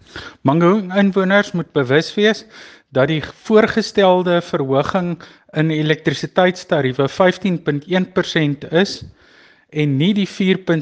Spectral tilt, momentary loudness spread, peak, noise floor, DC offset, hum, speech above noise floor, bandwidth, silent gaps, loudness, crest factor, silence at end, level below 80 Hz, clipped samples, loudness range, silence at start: -6.5 dB/octave; 8 LU; 0 dBFS; -49 dBFS; under 0.1%; none; 33 dB; 8.8 kHz; none; -17 LUFS; 16 dB; 0 s; -54 dBFS; under 0.1%; 2 LU; 0.15 s